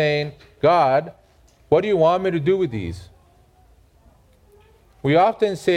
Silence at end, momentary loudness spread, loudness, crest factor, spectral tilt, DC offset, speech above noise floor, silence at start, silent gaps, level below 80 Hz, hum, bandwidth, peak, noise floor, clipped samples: 0 s; 14 LU; -19 LUFS; 18 dB; -7 dB/octave; under 0.1%; 36 dB; 0 s; none; -52 dBFS; none; 12.5 kHz; -4 dBFS; -54 dBFS; under 0.1%